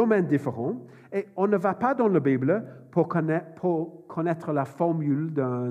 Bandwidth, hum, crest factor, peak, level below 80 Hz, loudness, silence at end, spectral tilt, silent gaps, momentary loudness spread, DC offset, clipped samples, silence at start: 9.8 kHz; none; 16 dB; -8 dBFS; -78 dBFS; -26 LUFS; 0 s; -10 dB/octave; none; 9 LU; under 0.1%; under 0.1%; 0 s